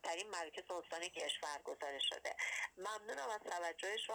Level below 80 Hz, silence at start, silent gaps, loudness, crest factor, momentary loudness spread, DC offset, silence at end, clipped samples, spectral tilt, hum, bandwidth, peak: -82 dBFS; 0.05 s; none; -43 LUFS; 16 dB; 6 LU; under 0.1%; 0 s; under 0.1%; 0.5 dB/octave; none; over 20 kHz; -28 dBFS